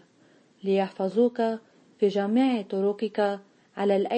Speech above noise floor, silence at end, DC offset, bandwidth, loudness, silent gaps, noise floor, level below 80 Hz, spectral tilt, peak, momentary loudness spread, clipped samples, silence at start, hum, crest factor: 35 dB; 0 s; under 0.1%; 8.6 kHz; -26 LUFS; none; -60 dBFS; -80 dBFS; -7.5 dB/octave; -12 dBFS; 10 LU; under 0.1%; 0.65 s; none; 14 dB